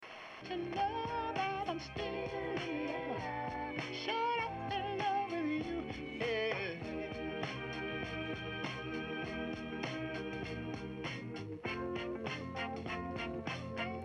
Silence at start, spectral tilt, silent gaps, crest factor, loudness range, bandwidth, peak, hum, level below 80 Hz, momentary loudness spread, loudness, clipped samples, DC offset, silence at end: 0 s; -6 dB/octave; none; 16 dB; 4 LU; 11 kHz; -24 dBFS; none; -60 dBFS; 6 LU; -39 LUFS; under 0.1%; under 0.1%; 0 s